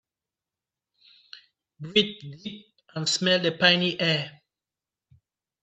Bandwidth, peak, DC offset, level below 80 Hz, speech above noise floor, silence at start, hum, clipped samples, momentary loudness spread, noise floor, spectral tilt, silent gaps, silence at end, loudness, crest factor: 9 kHz; -4 dBFS; under 0.1%; -72 dBFS; over 65 dB; 1.35 s; none; under 0.1%; 20 LU; under -90 dBFS; -3.5 dB/octave; none; 1.35 s; -23 LUFS; 26 dB